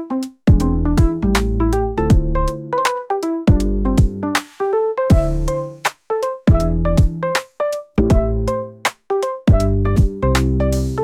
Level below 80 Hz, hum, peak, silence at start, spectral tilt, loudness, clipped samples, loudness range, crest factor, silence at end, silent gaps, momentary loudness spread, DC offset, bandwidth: -22 dBFS; none; -2 dBFS; 0 s; -6.5 dB/octave; -18 LUFS; under 0.1%; 1 LU; 14 dB; 0 s; none; 6 LU; under 0.1%; 16 kHz